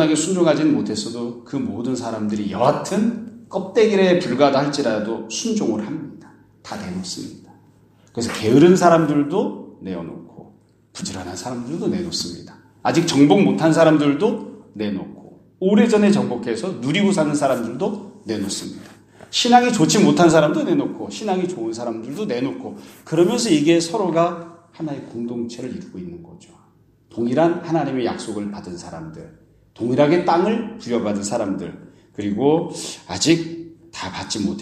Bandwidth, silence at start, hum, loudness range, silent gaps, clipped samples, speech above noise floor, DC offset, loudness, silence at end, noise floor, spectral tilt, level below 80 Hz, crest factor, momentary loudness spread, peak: 14 kHz; 0 s; none; 7 LU; none; under 0.1%; 36 dB; under 0.1%; -19 LUFS; 0 s; -55 dBFS; -5 dB/octave; -58 dBFS; 20 dB; 18 LU; 0 dBFS